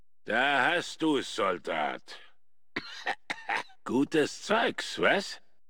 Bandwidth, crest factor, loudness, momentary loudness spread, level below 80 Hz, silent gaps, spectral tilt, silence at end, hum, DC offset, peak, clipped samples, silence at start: 17.5 kHz; 20 dB; -29 LUFS; 13 LU; -74 dBFS; none; -3.5 dB/octave; 0.3 s; none; 0.3%; -10 dBFS; under 0.1%; 0.25 s